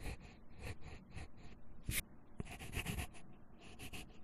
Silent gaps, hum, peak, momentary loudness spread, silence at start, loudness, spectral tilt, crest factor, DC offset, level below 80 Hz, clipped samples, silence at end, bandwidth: none; none; -24 dBFS; 18 LU; 0 s; -48 LUFS; -3.5 dB/octave; 24 dB; under 0.1%; -54 dBFS; under 0.1%; 0 s; 13 kHz